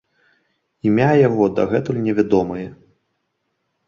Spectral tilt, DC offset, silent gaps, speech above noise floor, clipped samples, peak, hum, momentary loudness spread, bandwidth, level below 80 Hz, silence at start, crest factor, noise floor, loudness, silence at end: -8.5 dB/octave; under 0.1%; none; 55 dB; under 0.1%; -2 dBFS; none; 12 LU; 7.2 kHz; -52 dBFS; 0.85 s; 18 dB; -72 dBFS; -18 LUFS; 1.15 s